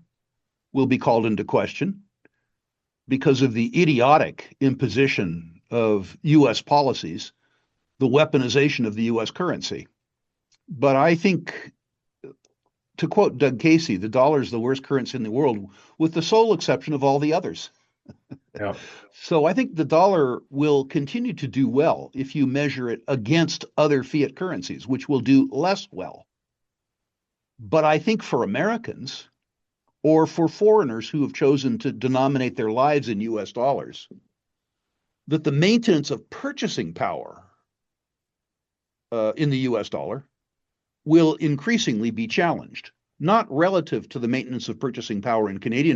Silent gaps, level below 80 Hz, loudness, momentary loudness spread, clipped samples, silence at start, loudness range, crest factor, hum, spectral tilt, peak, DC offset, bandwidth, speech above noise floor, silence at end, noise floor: none; -66 dBFS; -22 LUFS; 13 LU; under 0.1%; 0.75 s; 4 LU; 20 dB; none; -6 dB/octave; -4 dBFS; under 0.1%; 7.8 kHz; 64 dB; 0 s; -86 dBFS